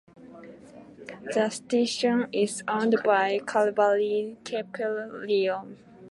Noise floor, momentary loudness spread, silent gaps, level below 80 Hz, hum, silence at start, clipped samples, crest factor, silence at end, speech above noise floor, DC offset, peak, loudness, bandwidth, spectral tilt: -48 dBFS; 20 LU; none; -74 dBFS; none; 0.2 s; under 0.1%; 18 dB; 0 s; 22 dB; under 0.1%; -10 dBFS; -26 LUFS; 11.5 kHz; -4 dB/octave